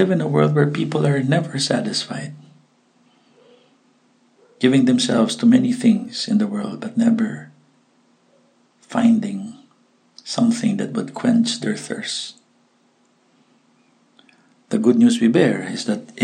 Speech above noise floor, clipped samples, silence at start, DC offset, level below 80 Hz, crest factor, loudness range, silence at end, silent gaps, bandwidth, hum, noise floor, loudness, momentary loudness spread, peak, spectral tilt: 42 dB; under 0.1%; 0 s; under 0.1%; -70 dBFS; 18 dB; 7 LU; 0 s; none; 10 kHz; none; -60 dBFS; -19 LUFS; 12 LU; -2 dBFS; -5.5 dB/octave